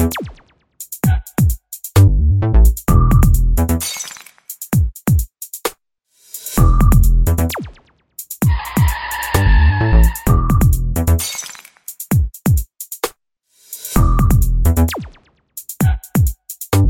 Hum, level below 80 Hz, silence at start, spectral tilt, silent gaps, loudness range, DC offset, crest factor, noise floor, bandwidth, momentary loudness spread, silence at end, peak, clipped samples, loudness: none; -18 dBFS; 0 s; -6 dB/octave; none; 4 LU; under 0.1%; 14 dB; -59 dBFS; 17 kHz; 18 LU; 0 s; 0 dBFS; under 0.1%; -16 LUFS